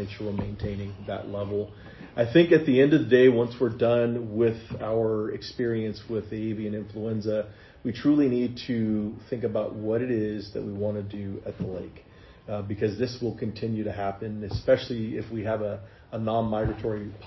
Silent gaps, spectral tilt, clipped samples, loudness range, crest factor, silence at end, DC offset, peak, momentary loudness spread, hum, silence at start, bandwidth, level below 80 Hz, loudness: none; -8.5 dB/octave; under 0.1%; 10 LU; 20 dB; 0 s; under 0.1%; -6 dBFS; 15 LU; none; 0 s; 6 kHz; -50 dBFS; -27 LUFS